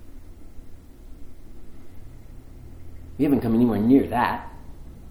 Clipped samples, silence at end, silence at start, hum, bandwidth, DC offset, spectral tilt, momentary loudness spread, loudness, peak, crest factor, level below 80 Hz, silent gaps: under 0.1%; 0 s; 0 s; none; 17 kHz; under 0.1%; -8 dB/octave; 27 LU; -21 LUFS; -6 dBFS; 20 dB; -44 dBFS; none